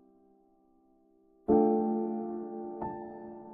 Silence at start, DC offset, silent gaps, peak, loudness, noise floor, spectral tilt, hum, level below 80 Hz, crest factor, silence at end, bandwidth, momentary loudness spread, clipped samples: 1.5 s; under 0.1%; none; -12 dBFS; -31 LUFS; -66 dBFS; -11.5 dB/octave; none; -64 dBFS; 20 dB; 0 s; 2.5 kHz; 17 LU; under 0.1%